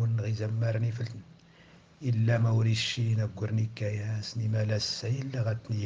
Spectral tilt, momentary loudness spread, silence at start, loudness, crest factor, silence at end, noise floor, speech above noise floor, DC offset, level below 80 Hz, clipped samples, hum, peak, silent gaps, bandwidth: -6 dB/octave; 8 LU; 0 s; -30 LUFS; 14 dB; 0 s; -56 dBFS; 27 dB; under 0.1%; -64 dBFS; under 0.1%; none; -16 dBFS; none; 7.6 kHz